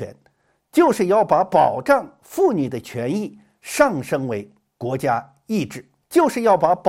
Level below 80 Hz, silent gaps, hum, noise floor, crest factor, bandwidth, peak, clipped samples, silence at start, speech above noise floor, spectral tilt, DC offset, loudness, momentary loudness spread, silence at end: -58 dBFS; none; none; -63 dBFS; 18 dB; 16.5 kHz; -2 dBFS; under 0.1%; 0 s; 44 dB; -6 dB/octave; under 0.1%; -20 LUFS; 14 LU; 0 s